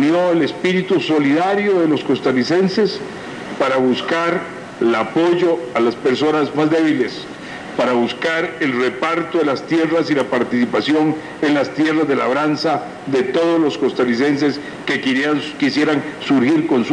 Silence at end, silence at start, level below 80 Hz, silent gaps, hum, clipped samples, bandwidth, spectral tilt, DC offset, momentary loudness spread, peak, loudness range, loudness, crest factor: 0 s; 0 s; -60 dBFS; none; none; under 0.1%; 10.5 kHz; -6 dB/octave; under 0.1%; 5 LU; -4 dBFS; 1 LU; -17 LUFS; 12 dB